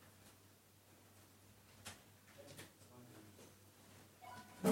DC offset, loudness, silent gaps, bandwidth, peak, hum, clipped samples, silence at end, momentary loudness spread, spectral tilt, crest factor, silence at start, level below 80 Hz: under 0.1%; -56 LUFS; none; 16.5 kHz; -22 dBFS; none; under 0.1%; 0 s; 10 LU; -5 dB/octave; 26 dB; 0 s; -84 dBFS